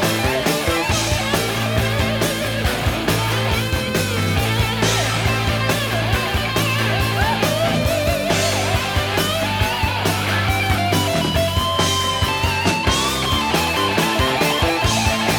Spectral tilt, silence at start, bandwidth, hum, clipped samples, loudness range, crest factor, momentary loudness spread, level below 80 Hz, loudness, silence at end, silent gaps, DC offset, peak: -4 dB/octave; 0 s; over 20 kHz; none; under 0.1%; 1 LU; 14 dB; 2 LU; -32 dBFS; -18 LUFS; 0 s; none; under 0.1%; -4 dBFS